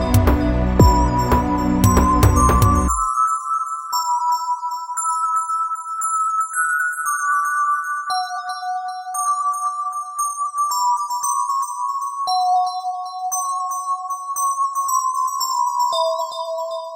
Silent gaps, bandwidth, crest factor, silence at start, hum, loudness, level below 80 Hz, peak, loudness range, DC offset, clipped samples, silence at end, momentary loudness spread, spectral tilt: none; 16.5 kHz; 18 dB; 0 s; none; -19 LUFS; -28 dBFS; 0 dBFS; 5 LU; under 0.1%; under 0.1%; 0 s; 10 LU; -4.5 dB/octave